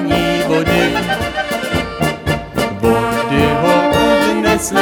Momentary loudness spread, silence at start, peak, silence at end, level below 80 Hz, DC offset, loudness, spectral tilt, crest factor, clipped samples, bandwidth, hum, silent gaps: 7 LU; 0 s; 0 dBFS; 0 s; -34 dBFS; under 0.1%; -15 LUFS; -5 dB/octave; 14 dB; under 0.1%; over 20 kHz; none; none